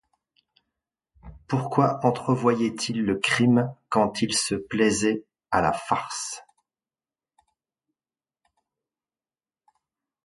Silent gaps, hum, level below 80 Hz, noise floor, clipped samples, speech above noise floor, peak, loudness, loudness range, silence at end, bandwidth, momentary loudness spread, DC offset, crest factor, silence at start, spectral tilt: none; none; -56 dBFS; under -90 dBFS; under 0.1%; over 66 dB; -4 dBFS; -24 LUFS; 9 LU; 3.85 s; 11.5 kHz; 8 LU; under 0.1%; 22 dB; 1.25 s; -4.5 dB/octave